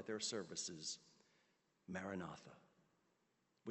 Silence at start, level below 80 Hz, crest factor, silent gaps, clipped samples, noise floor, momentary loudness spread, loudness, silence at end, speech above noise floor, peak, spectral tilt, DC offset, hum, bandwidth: 0 s; -88 dBFS; 20 dB; none; under 0.1%; -83 dBFS; 15 LU; -48 LUFS; 0 s; 35 dB; -30 dBFS; -3 dB/octave; under 0.1%; none; 8.4 kHz